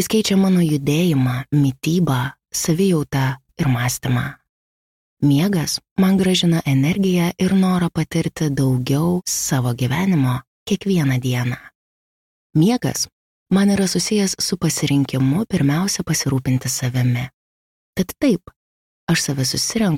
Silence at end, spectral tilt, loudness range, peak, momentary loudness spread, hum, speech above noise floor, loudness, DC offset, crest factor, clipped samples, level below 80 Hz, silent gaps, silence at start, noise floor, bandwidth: 0 s; -5 dB/octave; 3 LU; -6 dBFS; 7 LU; none; over 72 dB; -19 LUFS; under 0.1%; 14 dB; under 0.1%; -48 dBFS; 4.49-5.17 s, 5.91-5.96 s, 10.47-10.66 s, 11.75-12.50 s, 13.12-13.46 s, 17.34-17.93 s, 18.56-19.07 s; 0 s; under -90 dBFS; 16.5 kHz